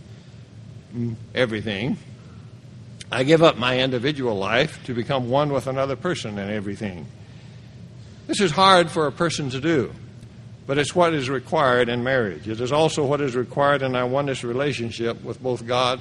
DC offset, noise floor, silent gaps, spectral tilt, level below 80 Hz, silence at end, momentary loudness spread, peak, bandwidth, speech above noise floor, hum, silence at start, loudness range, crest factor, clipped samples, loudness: under 0.1%; -43 dBFS; none; -5 dB/octave; -54 dBFS; 0 s; 24 LU; 0 dBFS; 11.5 kHz; 21 dB; none; 0.05 s; 5 LU; 22 dB; under 0.1%; -22 LUFS